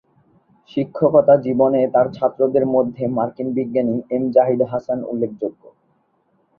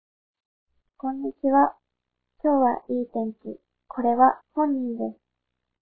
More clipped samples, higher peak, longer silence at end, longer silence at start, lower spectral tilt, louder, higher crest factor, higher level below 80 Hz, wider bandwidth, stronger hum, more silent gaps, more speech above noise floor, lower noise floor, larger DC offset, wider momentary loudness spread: neither; about the same, -2 dBFS vs -4 dBFS; first, 1.05 s vs 0.7 s; second, 0.75 s vs 1.05 s; about the same, -10.5 dB/octave vs -11.5 dB/octave; first, -18 LUFS vs -24 LUFS; about the same, 18 dB vs 20 dB; first, -60 dBFS vs -70 dBFS; first, 4.9 kHz vs 3.5 kHz; neither; neither; second, 46 dB vs 59 dB; second, -63 dBFS vs -82 dBFS; neither; second, 10 LU vs 14 LU